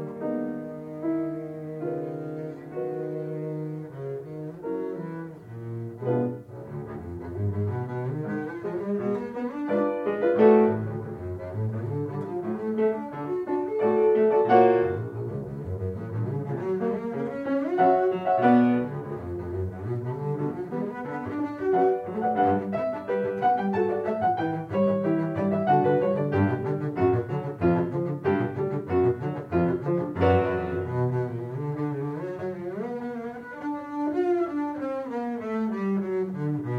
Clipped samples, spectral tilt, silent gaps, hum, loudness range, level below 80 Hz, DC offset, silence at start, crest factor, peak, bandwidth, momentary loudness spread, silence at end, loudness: under 0.1%; -10 dB/octave; none; none; 9 LU; -62 dBFS; under 0.1%; 0 s; 20 dB; -6 dBFS; 6.4 kHz; 13 LU; 0 s; -27 LUFS